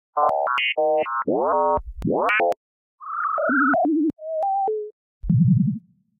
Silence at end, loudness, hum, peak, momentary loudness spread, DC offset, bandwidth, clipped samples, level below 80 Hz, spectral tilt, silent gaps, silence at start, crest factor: 0.4 s; -21 LUFS; none; -8 dBFS; 12 LU; under 0.1%; 6.6 kHz; under 0.1%; -44 dBFS; -8.5 dB/octave; 2.57-2.98 s, 4.92-5.21 s; 0.15 s; 14 dB